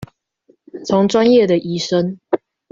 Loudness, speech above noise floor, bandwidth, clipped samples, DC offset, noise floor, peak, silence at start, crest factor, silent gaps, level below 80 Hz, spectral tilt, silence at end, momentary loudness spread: -16 LUFS; 43 dB; 7.8 kHz; under 0.1%; under 0.1%; -57 dBFS; -2 dBFS; 0 s; 14 dB; none; -56 dBFS; -6 dB/octave; 0.35 s; 11 LU